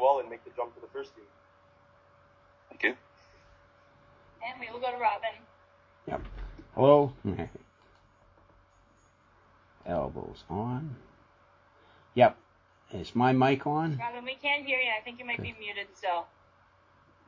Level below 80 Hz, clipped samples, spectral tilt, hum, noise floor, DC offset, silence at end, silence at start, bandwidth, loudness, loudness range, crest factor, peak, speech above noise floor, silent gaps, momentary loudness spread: -56 dBFS; under 0.1%; -7.5 dB/octave; none; -63 dBFS; under 0.1%; 1 s; 0 s; 7.4 kHz; -30 LUFS; 11 LU; 26 dB; -6 dBFS; 34 dB; none; 19 LU